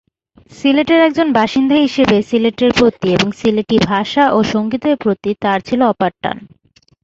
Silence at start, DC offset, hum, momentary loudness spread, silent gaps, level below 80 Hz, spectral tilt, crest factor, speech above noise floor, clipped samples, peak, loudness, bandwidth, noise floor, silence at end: 0.55 s; under 0.1%; none; 6 LU; none; -46 dBFS; -6 dB/octave; 14 dB; 33 dB; under 0.1%; 0 dBFS; -14 LUFS; 8 kHz; -47 dBFS; 0.6 s